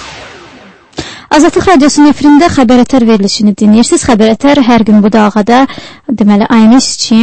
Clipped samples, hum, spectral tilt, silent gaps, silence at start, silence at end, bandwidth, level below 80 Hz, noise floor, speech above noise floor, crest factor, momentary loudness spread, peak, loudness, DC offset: 2%; none; -5 dB/octave; none; 0 s; 0 s; 8.8 kHz; -34 dBFS; -35 dBFS; 30 dB; 6 dB; 16 LU; 0 dBFS; -6 LUFS; under 0.1%